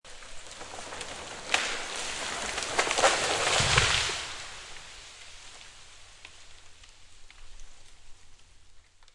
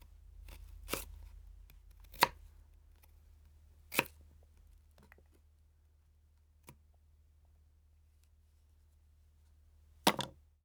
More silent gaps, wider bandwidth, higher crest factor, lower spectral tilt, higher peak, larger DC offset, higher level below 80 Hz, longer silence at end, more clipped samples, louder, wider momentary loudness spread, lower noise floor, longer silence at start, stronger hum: neither; second, 11.5 kHz vs over 20 kHz; second, 28 dB vs 38 dB; about the same, -1.5 dB/octave vs -2.5 dB/octave; first, -4 dBFS vs -8 dBFS; neither; first, -50 dBFS vs -60 dBFS; second, 0.05 s vs 0.35 s; neither; first, -27 LUFS vs -36 LUFS; second, 25 LU vs 28 LU; second, -52 dBFS vs -67 dBFS; about the same, 0.05 s vs 0.1 s; neither